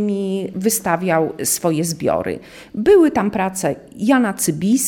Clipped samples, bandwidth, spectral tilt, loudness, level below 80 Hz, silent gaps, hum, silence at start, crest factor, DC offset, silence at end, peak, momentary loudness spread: under 0.1%; 17.5 kHz; -4.5 dB/octave; -18 LUFS; -50 dBFS; none; none; 0 s; 16 dB; under 0.1%; 0 s; -2 dBFS; 10 LU